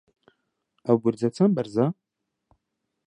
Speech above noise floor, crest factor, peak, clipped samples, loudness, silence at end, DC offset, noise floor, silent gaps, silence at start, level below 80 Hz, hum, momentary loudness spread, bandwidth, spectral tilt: 57 dB; 20 dB; -6 dBFS; under 0.1%; -24 LUFS; 1.15 s; under 0.1%; -79 dBFS; none; 0.85 s; -70 dBFS; none; 10 LU; 10 kHz; -8.5 dB/octave